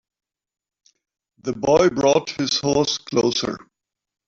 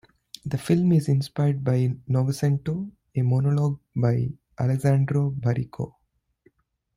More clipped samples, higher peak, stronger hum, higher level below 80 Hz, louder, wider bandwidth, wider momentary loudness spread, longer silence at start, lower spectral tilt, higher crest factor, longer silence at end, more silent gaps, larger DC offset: neither; first, -4 dBFS vs -8 dBFS; neither; about the same, -54 dBFS vs -56 dBFS; first, -20 LUFS vs -24 LUFS; second, 7.8 kHz vs 14.5 kHz; about the same, 13 LU vs 11 LU; first, 1.45 s vs 0.45 s; second, -4 dB/octave vs -8 dB/octave; about the same, 18 dB vs 16 dB; second, 0.7 s vs 1.1 s; neither; neither